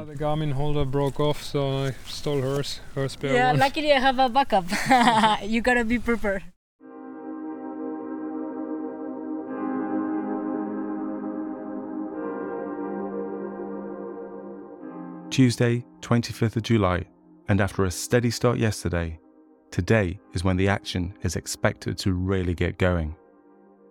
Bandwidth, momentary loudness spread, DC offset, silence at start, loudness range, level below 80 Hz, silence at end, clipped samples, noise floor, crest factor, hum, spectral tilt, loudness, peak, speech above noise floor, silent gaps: 19 kHz; 14 LU; under 0.1%; 0 s; 11 LU; -44 dBFS; 0.75 s; under 0.1%; -54 dBFS; 20 dB; none; -5.5 dB/octave; -25 LUFS; -6 dBFS; 31 dB; 6.56-6.79 s